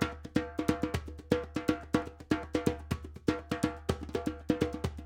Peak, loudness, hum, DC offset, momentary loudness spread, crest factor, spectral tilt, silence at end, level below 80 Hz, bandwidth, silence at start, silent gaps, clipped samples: -10 dBFS; -34 LUFS; none; under 0.1%; 5 LU; 24 dB; -6 dB/octave; 0 s; -48 dBFS; 17 kHz; 0 s; none; under 0.1%